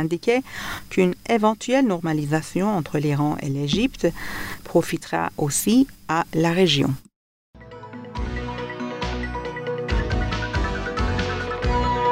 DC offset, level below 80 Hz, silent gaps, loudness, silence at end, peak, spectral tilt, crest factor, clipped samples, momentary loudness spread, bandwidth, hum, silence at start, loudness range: under 0.1%; -34 dBFS; 7.16-7.53 s; -23 LUFS; 0 s; -6 dBFS; -5 dB/octave; 16 dB; under 0.1%; 11 LU; 16 kHz; none; 0 s; 6 LU